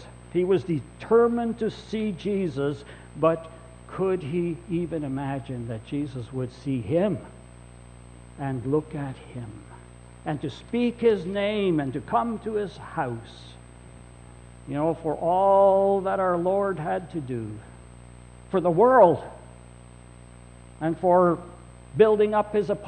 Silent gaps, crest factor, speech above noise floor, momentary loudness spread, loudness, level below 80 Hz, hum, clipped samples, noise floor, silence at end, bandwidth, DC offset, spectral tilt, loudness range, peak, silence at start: none; 20 dB; 22 dB; 19 LU; -25 LUFS; -50 dBFS; 60 Hz at -45 dBFS; under 0.1%; -47 dBFS; 0 s; 8.6 kHz; under 0.1%; -7.5 dB/octave; 7 LU; -6 dBFS; 0 s